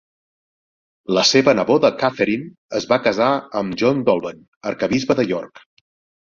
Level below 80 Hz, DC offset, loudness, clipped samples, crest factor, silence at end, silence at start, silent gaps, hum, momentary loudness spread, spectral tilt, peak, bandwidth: -58 dBFS; under 0.1%; -18 LUFS; under 0.1%; 18 dB; 0.75 s; 1.1 s; 2.58-2.69 s, 4.48-4.61 s; none; 13 LU; -4.5 dB/octave; -2 dBFS; 7.6 kHz